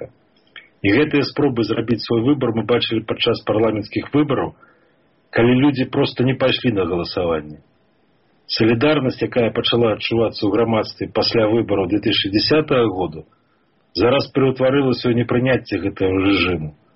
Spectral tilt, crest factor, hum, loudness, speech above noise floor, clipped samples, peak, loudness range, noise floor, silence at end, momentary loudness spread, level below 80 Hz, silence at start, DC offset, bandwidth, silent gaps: -4.5 dB/octave; 14 dB; none; -18 LUFS; 43 dB; under 0.1%; -4 dBFS; 2 LU; -61 dBFS; 0.25 s; 7 LU; -48 dBFS; 0 s; under 0.1%; 6 kHz; none